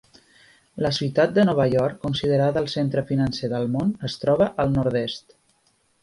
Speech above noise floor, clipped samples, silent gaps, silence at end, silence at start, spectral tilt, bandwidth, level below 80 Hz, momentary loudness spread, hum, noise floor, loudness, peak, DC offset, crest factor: 43 dB; under 0.1%; none; 0.85 s; 0.75 s; -7 dB/octave; 11.5 kHz; -50 dBFS; 8 LU; none; -65 dBFS; -22 LUFS; -6 dBFS; under 0.1%; 16 dB